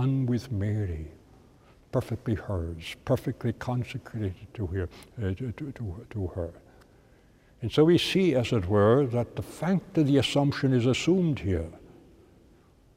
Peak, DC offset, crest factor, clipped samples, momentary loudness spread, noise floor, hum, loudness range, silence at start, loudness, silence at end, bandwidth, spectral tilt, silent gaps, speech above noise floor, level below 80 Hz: -8 dBFS; under 0.1%; 20 dB; under 0.1%; 14 LU; -58 dBFS; none; 10 LU; 0 s; -28 LUFS; 1.1 s; 15.5 kHz; -7 dB/octave; none; 31 dB; -50 dBFS